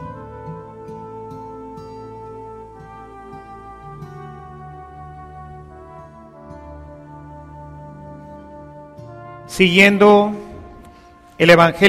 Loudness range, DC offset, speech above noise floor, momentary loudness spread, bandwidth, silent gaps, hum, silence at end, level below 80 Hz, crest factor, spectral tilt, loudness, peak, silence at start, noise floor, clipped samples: 21 LU; under 0.1%; 34 dB; 28 LU; 16 kHz; none; none; 0 s; -46 dBFS; 20 dB; -5.5 dB/octave; -12 LUFS; 0 dBFS; 0 s; -45 dBFS; under 0.1%